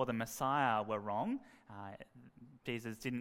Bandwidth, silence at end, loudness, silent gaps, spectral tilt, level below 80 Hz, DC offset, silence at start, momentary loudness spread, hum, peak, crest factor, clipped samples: 16 kHz; 0 s; -38 LUFS; none; -5 dB/octave; -72 dBFS; under 0.1%; 0 s; 19 LU; none; -18 dBFS; 20 dB; under 0.1%